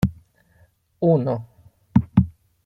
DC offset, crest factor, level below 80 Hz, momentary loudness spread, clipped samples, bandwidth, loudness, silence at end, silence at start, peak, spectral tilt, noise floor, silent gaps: under 0.1%; 20 dB; -44 dBFS; 10 LU; under 0.1%; 7.6 kHz; -22 LUFS; 0.35 s; 0 s; -2 dBFS; -10 dB/octave; -59 dBFS; none